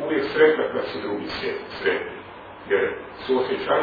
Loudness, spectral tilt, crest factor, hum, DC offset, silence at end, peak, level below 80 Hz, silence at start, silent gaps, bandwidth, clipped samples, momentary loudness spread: -24 LUFS; -6.5 dB/octave; 20 dB; none; under 0.1%; 0 s; -4 dBFS; -56 dBFS; 0 s; none; 5 kHz; under 0.1%; 16 LU